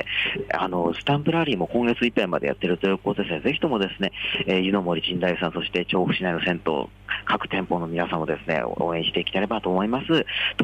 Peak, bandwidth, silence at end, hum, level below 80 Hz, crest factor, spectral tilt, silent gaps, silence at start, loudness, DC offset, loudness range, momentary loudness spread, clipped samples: -10 dBFS; 9.2 kHz; 0 s; none; -50 dBFS; 14 dB; -7 dB/octave; none; 0 s; -24 LUFS; under 0.1%; 2 LU; 4 LU; under 0.1%